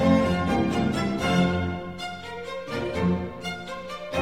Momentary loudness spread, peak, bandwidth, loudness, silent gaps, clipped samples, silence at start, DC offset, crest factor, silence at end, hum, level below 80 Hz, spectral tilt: 12 LU; -8 dBFS; 13.5 kHz; -26 LUFS; none; under 0.1%; 0 s; 0.3%; 16 dB; 0 s; none; -44 dBFS; -6.5 dB/octave